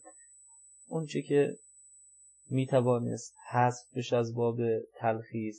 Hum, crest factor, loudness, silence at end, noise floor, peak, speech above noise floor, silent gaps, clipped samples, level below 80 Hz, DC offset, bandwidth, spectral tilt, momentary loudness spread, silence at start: 50 Hz at -80 dBFS; 18 dB; -31 LUFS; 0 s; -59 dBFS; -14 dBFS; 29 dB; none; under 0.1%; -82 dBFS; under 0.1%; 9.6 kHz; -6.5 dB/octave; 10 LU; 0.05 s